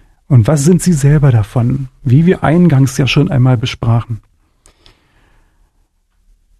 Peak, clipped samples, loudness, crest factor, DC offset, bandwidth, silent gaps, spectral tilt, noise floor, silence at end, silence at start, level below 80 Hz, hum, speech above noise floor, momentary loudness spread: 0 dBFS; under 0.1%; -11 LUFS; 12 dB; under 0.1%; 13 kHz; none; -6.5 dB/octave; -57 dBFS; 2.4 s; 0.3 s; -34 dBFS; none; 47 dB; 7 LU